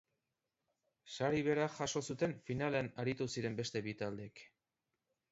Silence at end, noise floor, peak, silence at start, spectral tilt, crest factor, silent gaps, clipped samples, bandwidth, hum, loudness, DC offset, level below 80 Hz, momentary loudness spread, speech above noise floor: 0.85 s; -89 dBFS; -22 dBFS; 1.05 s; -5 dB/octave; 20 dB; none; under 0.1%; 8 kHz; none; -39 LUFS; under 0.1%; -70 dBFS; 11 LU; 51 dB